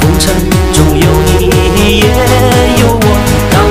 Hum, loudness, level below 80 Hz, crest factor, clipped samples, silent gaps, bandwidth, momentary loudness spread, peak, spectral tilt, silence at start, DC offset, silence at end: none; -8 LUFS; -14 dBFS; 8 dB; 1%; none; 16 kHz; 2 LU; 0 dBFS; -5 dB/octave; 0 s; 2%; 0 s